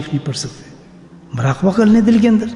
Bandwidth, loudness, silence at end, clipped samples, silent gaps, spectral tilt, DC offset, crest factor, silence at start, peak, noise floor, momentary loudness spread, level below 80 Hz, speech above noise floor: 11 kHz; -14 LUFS; 0 s; under 0.1%; none; -6.5 dB/octave; under 0.1%; 14 dB; 0 s; 0 dBFS; -40 dBFS; 15 LU; -46 dBFS; 27 dB